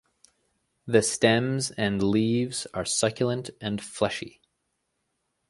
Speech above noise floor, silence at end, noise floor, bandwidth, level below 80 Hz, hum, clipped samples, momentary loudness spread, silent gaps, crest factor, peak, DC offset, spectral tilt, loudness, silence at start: 52 dB; 1.2 s; -77 dBFS; 11.5 kHz; -58 dBFS; none; under 0.1%; 11 LU; none; 22 dB; -6 dBFS; under 0.1%; -4.5 dB/octave; -26 LUFS; 0.85 s